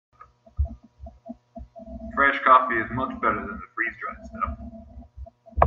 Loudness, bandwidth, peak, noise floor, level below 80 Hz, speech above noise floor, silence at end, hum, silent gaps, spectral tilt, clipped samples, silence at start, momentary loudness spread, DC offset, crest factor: -24 LUFS; 7 kHz; 0 dBFS; -46 dBFS; -40 dBFS; 23 dB; 0 s; none; none; -8 dB/octave; under 0.1%; 0.6 s; 27 LU; under 0.1%; 26 dB